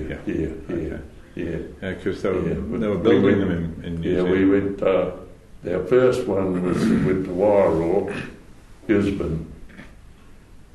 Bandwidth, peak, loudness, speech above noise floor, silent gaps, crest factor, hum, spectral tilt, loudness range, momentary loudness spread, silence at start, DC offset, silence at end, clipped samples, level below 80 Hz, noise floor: 12 kHz; -6 dBFS; -22 LUFS; 24 dB; none; 16 dB; none; -8 dB/octave; 3 LU; 14 LU; 0 s; under 0.1%; 0.15 s; under 0.1%; -42 dBFS; -45 dBFS